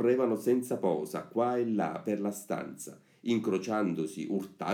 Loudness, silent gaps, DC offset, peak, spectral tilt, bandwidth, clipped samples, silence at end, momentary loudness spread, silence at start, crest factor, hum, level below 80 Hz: -32 LUFS; none; under 0.1%; -14 dBFS; -6 dB/octave; 17.5 kHz; under 0.1%; 0 s; 9 LU; 0 s; 16 dB; none; -80 dBFS